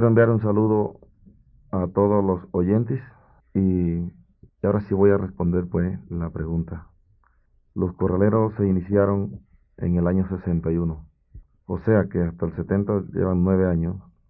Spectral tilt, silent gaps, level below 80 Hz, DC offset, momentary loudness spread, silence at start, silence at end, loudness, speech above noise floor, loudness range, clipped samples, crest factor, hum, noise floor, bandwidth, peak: -14.5 dB/octave; none; -40 dBFS; under 0.1%; 11 LU; 0 s; 0.3 s; -23 LUFS; 40 dB; 2 LU; under 0.1%; 18 dB; none; -61 dBFS; 2.8 kHz; -4 dBFS